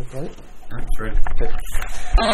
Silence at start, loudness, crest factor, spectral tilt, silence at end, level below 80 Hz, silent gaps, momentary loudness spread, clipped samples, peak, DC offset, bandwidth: 0 s; -28 LUFS; 12 dB; -4.5 dB/octave; 0 s; -20 dBFS; none; 12 LU; under 0.1%; -2 dBFS; under 0.1%; 12.5 kHz